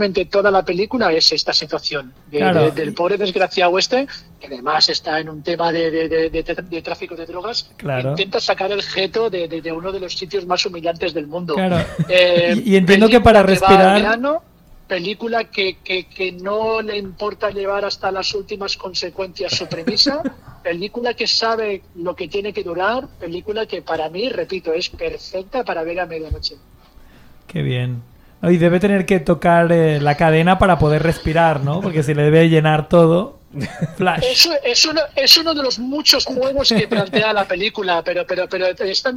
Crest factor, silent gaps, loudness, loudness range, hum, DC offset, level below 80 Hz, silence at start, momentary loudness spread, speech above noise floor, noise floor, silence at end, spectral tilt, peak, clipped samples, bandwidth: 18 dB; none; -17 LUFS; 10 LU; none; under 0.1%; -40 dBFS; 0 s; 13 LU; 28 dB; -45 dBFS; 0 s; -4.5 dB/octave; 0 dBFS; under 0.1%; 16.5 kHz